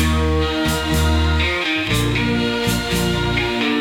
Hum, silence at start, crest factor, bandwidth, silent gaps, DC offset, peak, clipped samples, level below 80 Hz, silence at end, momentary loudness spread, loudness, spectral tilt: none; 0 s; 14 dB; 16.5 kHz; none; under 0.1%; -4 dBFS; under 0.1%; -26 dBFS; 0 s; 2 LU; -18 LUFS; -5 dB/octave